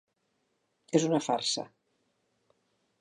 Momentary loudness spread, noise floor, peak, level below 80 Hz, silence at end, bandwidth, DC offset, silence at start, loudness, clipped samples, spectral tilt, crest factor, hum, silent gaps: 8 LU; -77 dBFS; -10 dBFS; -84 dBFS; 1.35 s; 11.5 kHz; under 0.1%; 0.9 s; -29 LUFS; under 0.1%; -4 dB/octave; 24 dB; none; none